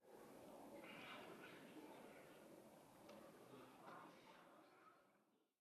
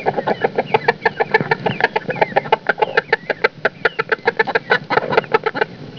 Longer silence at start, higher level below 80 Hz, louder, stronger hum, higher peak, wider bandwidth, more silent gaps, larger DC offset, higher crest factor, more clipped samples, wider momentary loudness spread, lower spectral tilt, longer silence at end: about the same, 0 s vs 0 s; second, under -90 dBFS vs -58 dBFS; second, -62 LUFS vs -18 LUFS; neither; second, -46 dBFS vs 0 dBFS; first, 13.5 kHz vs 5.4 kHz; neither; second, under 0.1% vs 0.2%; about the same, 16 dB vs 18 dB; neither; first, 9 LU vs 3 LU; second, -4 dB/octave vs -6 dB/octave; first, 0.15 s vs 0 s